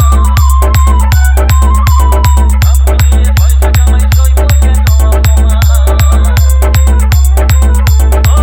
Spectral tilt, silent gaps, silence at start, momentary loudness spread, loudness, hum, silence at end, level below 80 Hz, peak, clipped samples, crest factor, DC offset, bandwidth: -5.5 dB/octave; none; 0 s; 0 LU; -8 LUFS; none; 0 s; -6 dBFS; 0 dBFS; 0.5%; 6 dB; under 0.1%; 17 kHz